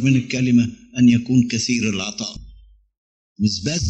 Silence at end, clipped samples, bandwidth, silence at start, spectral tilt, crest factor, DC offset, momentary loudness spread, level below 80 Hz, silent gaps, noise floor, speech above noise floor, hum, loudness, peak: 0 s; under 0.1%; 8.4 kHz; 0 s; -5 dB/octave; 16 dB; under 0.1%; 11 LU; -48 dBFS; 2.98-3.36 s; -47 dBFS; 29 dB; none; -19 LUFS; -4 dBFS